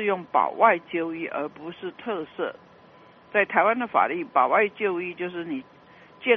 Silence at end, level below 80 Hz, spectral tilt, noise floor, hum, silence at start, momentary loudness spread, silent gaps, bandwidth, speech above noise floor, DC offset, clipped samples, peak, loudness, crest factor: 0 s; -74 dBFS; -2.5 dB/octave; -52 dBFS; none; 0 s; 14 LU; none; 5 kHz; 27 dB; under 0.1%; under 0.1%; -4 dBFS; -25 LUFS; 20 dB